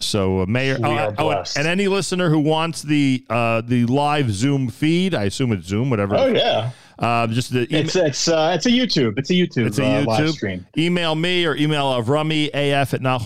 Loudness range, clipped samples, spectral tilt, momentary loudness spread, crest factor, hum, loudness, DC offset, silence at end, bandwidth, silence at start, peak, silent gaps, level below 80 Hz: 1 LU; under 0.1%; -5.5 dB/octave; 4 LU; 14 dB; none; -19 LUFS; 1%; 0 s; 15.5 kHz; 0 s; -6 dBFS; none; -52 dBFS